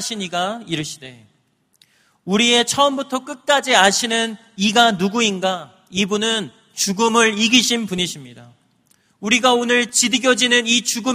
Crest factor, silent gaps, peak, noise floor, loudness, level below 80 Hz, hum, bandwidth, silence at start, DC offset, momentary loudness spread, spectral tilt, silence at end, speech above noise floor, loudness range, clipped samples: 18 dB; none; 0 dBFS; -60 dBFS; -17 LUFS; -60 dBFS; none; 15.5 kHz; 0 s; under 0.1%; 12 LU; -2 dB/octave; 0 s; 42 dB; 3 LU; under 0.1%